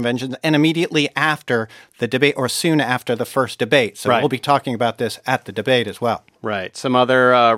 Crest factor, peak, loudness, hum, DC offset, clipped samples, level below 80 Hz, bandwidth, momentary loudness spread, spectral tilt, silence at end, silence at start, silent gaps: 18 dB; 0 dBFS; -18 LUFS; none; under 0.1%; under 0.1%; -64 dBFS; 16 kHz; 8 LU; -5 dB/octave; 0 s; 0 s; none